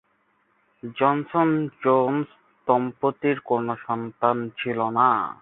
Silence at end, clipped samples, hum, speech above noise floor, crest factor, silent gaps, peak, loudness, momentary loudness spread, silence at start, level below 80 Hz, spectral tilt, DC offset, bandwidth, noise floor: 0.1 s; under 0.1%; none; 44 dB; 20 dB; none; -4 dBFS; -23 LUFS; 9 LU; 0.85 s; -68 dBFS; -11 dB/octave; under 0.1%; 4 kHz; -67 dBFS